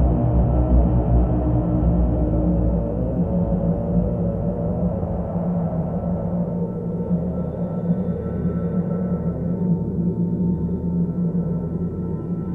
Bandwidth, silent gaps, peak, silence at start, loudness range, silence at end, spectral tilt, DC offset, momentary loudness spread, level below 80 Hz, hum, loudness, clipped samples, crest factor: 2.5 kHz; none; -4 dBFS; 0 s; 4 LU; 0 s; -13 dB/octave; under 0.1%; 6 LU; -26 dBFS; none; -22 LUFS; under 0.1%; 16 dB